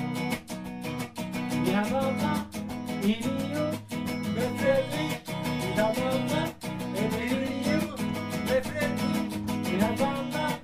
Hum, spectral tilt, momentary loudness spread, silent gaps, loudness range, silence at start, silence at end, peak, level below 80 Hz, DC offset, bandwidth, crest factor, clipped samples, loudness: none; -5.5 dB/octave; 8 LU; none; 1 LU; 0 s; 0 s; -10 dBFS; -52 dBFS; under 0.1%; 15.5 kHz; 18 dB; under 0.1%; -29 LUFS